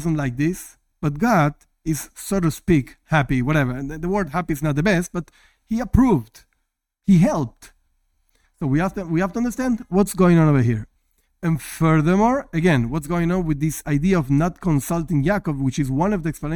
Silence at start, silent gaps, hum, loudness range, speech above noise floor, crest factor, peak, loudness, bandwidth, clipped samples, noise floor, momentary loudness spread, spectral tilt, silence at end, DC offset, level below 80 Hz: 0 s; none; none; 3 LU; 55 dB; 16 dB; -4 dBFS; -21 LUFS; 17.5 kHz; under 0.1%; -74 dBFS; 10 LU; -7 dB/octave; 0 s; under 0.1%; -38 dBFS